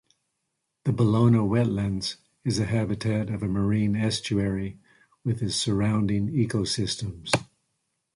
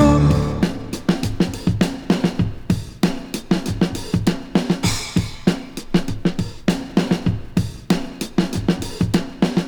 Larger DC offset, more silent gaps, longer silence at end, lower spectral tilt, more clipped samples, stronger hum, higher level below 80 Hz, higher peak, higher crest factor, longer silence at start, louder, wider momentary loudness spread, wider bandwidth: neither; neither; first, 0.7 s vs 0 s; about the same, -6 dB/octave vs -6 dB/octave; neither; neither; second, -48 dBFS vs -32 dBFS; about the same, -4 dBFS vs -2 dBFS; about the same, 20 dB vs 18 dB; first, 0.85 s vs 0 s; second, -26 LUFS vs -21 LUFS; first, 10 LU vs 4 LU; second, 11.5 kHz vs over 20 kHz